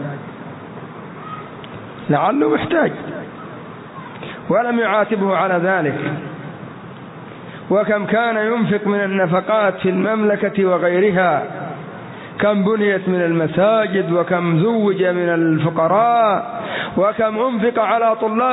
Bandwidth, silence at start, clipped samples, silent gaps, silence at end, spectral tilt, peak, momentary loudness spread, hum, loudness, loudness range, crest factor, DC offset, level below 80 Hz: 4 kHz; 0 s; under 0.1%; none; 0 s; -11 dB/octave; -4 dBFS; 18 LU; none; -17 LUFS; 4 LU; 14 dB; under 0.1%; -58 dBFS